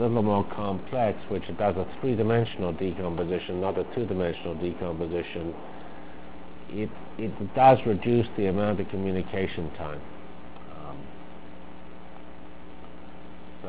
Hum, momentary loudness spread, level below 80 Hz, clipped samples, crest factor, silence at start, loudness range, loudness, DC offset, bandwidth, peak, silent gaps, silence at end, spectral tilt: none; 22 LU; -48 dBFS; under 0.1%; 24 dB; 0 s; 16 LU; -28 LUFS; 2%; 4 kHz; -6 dBFS; none; 0 s; -11 dB/octave